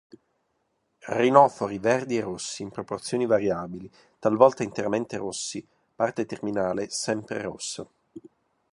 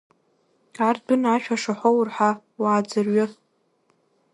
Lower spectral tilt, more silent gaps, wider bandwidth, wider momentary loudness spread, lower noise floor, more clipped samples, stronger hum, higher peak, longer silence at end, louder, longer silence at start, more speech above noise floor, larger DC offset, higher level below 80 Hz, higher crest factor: about the same, -4.5 dB/octave vs -5.5 dB/octave; neither; about the same, 11.5 kHz vs 11.5 kHz; first, 14 LU vs 4 LU; first, -74 dBFS vs -66 dBFS; neither; neither; about the same, -2 dBFS vs -4 dBFS; second, 0.45 s vs 1 s; second, -26 LUFS vs -22 LUFS; first, 1.05 s vs 0.8 s; first, 49 dB vs 45 dB; neither; first, -64 dBFS vs -74 dBFS; first, 24 dB vs 18 dB